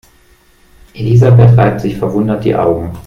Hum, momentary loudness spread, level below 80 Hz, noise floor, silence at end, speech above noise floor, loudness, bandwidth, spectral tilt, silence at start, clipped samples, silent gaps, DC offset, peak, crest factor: none; 10 LU; -36 dBFS; -47 dBFS; 0.05 s; 38 dB; -10 LUFS; 6.6 kHz; -9.5 dB/octave; 0.95 s; under 0.1%; none; under 0.1%; 0 dBFS; 10 dB